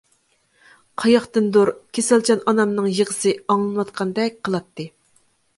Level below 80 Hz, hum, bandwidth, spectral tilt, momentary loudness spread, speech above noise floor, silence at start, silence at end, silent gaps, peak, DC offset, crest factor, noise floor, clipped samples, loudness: -64 dBFS; none; 11.5 kHz; -4.5 dB/octave; 10 LU; 44 dB; 1 s; 0.7 s; none; -4 dBFS; under 0.1%; 18 dB; -63 dBFS; under 0.1%; -20 LUFS